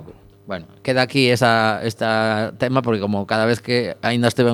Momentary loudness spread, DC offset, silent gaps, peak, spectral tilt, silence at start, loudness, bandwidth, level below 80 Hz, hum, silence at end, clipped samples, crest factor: 7 LU; under 0.1%; none; 0 dBFS; -5.5 dB/octave; 0 s; -19 LUFS; 19 kHz; -58 dBFS; none; 0 s; under 0.1%; 20 dB